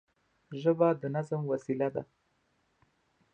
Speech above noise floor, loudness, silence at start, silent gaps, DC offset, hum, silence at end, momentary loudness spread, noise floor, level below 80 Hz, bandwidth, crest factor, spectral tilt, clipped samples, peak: 44 dB; -31 LUFS; 0.5 s; none; under 0.1%; none; 1.3 s; 9 LU; -74 dBFS; -76 dBFS; 8.6 kHz; 20 dB; -8.5 dB/octave; under 0.1%; -12 dBFS